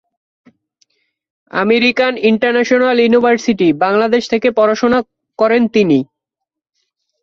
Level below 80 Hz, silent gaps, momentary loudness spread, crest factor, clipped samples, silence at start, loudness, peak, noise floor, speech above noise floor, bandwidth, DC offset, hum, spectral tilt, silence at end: -56 dBFS; none; 6 LU; 14 dB; under 0.1%; 1.55 s; -13 LUFS; 0 dBFS; -81 dBFS; 69 dB; 7.4 kHz; under 0.1%; none; -5.5 dB/octave; 1.2 s